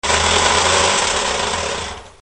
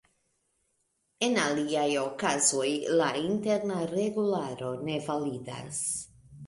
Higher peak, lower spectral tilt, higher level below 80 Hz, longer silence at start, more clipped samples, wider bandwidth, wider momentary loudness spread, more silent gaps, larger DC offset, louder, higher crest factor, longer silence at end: first, 0 dBFS vs -12 dBFS; second, -1.5 dB/octave vs -3.5 dB/octave; first, -34 dBFS vs -68 dBFS; second, 0.05 s vs 1.2 s; neither; about the same, 11.5 kHz vs 11.5 kHz; about the same, 10 LU vs 10 LU; neither; first, 0.2% vs under 0.1%; first, -15 LUFS vs -29 LUFS; about the same, 16 dB vs 18 dB; first, 0.15 s vs 0 s